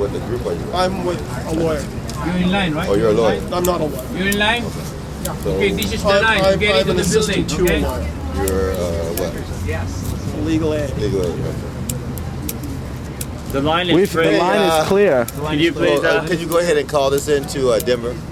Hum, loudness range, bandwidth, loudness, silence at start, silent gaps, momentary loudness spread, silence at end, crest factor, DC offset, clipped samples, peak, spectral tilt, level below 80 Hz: none; 6 LU; 16 kHz; -18 LUFS; 0 s; none; 11 LU; 0 s; 16 dB; under 0.1%; under 0.1%; -2 dBFS; -5 dB/octave; -30 dBFS